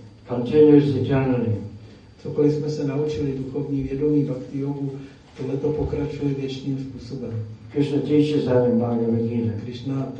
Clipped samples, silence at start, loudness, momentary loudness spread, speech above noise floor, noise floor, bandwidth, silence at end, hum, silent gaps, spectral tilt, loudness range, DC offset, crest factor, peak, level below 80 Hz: under 0.1%; 0 s; -22 LUFS; 13 LU; 22 dB; -43 dBFS; 8 kHz; 0 s; none; none; -9 dB/octave; 7 LU; under 0.1%; 20 dB; -4 dBFS; -48 dBFS